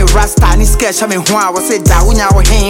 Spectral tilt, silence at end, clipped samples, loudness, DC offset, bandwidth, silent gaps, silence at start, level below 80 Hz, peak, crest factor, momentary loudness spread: -4 dB/octave; 0 s; under 0.1%; -10 LUFS; under 0.1%; 16.5 kHz; none; 0 s; -10 dBFS; 0 dBFS; 8 dB; 3 LU